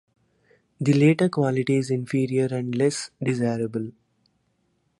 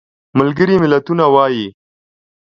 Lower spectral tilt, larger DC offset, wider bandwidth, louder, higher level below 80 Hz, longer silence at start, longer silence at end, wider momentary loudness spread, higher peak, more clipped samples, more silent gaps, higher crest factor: second, -6.5 dB/octave vs -8.5 dB/octave; neither; first, 11.5 kHz vs 7 kHz; second, -23 LUFS vs -13 LUFS; second, -66 dBFS vs -52 dBFS; first, 0.8 s vs 0.35 s; first, 1.1 s vs 0.75 s; about the same, 9 LU vs 9 LU; second, -6 dBFS vs 0 dBFS; neither; neither; about the same, 18 dB vs 14 dB